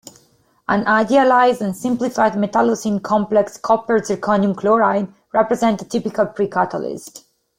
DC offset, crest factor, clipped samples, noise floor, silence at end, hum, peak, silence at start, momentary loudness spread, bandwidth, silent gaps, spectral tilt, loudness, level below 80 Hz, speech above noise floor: under 0.1%; 16 dB; under 0.1%; -57 dBFS; 0.4 s; none; -2 dBFS; 0.7 s; 8 LU; 16 kHz; none; -5.5 dB/octave; -18 LUFS; -58 dBFS; 40 dB